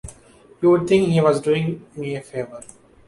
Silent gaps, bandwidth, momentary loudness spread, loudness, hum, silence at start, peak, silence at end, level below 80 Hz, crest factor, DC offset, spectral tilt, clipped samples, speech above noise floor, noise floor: none; 11.5 kHz; 15 LU; -20 LUFS; none; 0.05 s; -4 dBFS; 0.45 s; -52 dBFS; 16 dB; under 0.1%; -7 dB/octave; under 0.1%; 30 dB; -49 dBFS